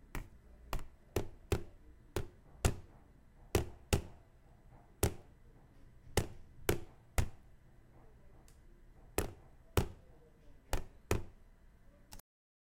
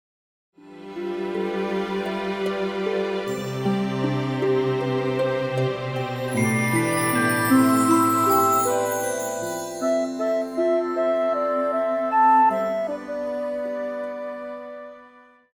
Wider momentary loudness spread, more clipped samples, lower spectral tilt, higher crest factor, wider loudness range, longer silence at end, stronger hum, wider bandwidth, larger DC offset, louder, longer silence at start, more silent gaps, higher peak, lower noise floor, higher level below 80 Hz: first, 20 LU vs 12 LU; neither; about the same, -5 dB/octave vs -5.5 dB/octave; first, 32 dB vs 16 dB; about the same, 4 LU vs 6 LU; about the same, 0.45 s vs 0.45 s; neither; second, 16.5 kHz vs over 20 kHz; neither; second, -41 LUFS vs -23 LUFS; second, 0.15 s vs 0.65 s; neither; about the same, -8 dBFS vs -6 dBFS; first, -61 dBFS vs -51 dBFS; first, -46 dBFS vs -62 dBFS